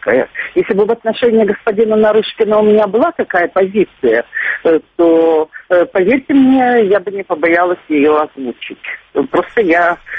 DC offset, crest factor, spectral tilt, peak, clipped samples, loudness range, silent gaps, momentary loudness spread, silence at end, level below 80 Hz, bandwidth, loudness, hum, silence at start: under 0.1%; 12 dB; -8 dB/octave; 0 dBFS; under 0.1%; 2 LU; none; 7 LU; 0 s; -52 dBFS; 4.9 kHz; -12 LUFS; none; 0.05 s